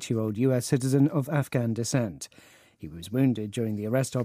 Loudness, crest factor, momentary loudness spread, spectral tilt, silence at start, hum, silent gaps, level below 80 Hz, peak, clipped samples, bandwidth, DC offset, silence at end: -27 LUFS; 18 dB; 17 LU; -6.5 dB/octave; 0 s; none; none; -64 dBFS; -10 dBFS; under 0.1%; 15.5 kHz; under 0.1%; 0 s